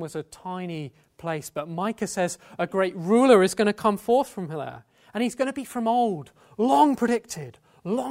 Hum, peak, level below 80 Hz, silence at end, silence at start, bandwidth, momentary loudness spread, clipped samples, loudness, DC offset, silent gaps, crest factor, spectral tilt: none; -4 dBFS; -64 dBFS; 0 s; 0 s; 16 kHz; 17 LU; under 0.1%; -24 LUFS; under 0.1%; none; 20 dB; -5.5 dB/octave